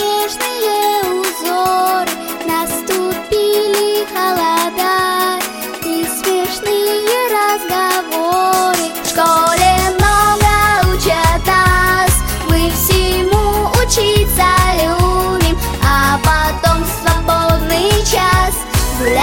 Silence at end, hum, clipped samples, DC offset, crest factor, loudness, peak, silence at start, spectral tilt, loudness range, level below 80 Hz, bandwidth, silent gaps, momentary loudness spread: 0 s; none; under 0.1%; under 0.1%; 14 dB; -13 LUFS; 0 dBFS; 0 s; -4 dB/octave; 4 LU; -22 dBFS; 17 kHz; none; 6 LU